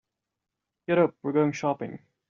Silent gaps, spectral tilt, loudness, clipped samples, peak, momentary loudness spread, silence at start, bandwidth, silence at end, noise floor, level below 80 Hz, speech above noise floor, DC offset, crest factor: none; -6.5 dB/octave; -26 LUFS; under 0.1%; -8 dBFS; 13 LU; 0.9 s; 7.2 kHz; 0.3 s; -86 dBFS; -72 dBFS; 60 dB; under 0.1%; 20 dB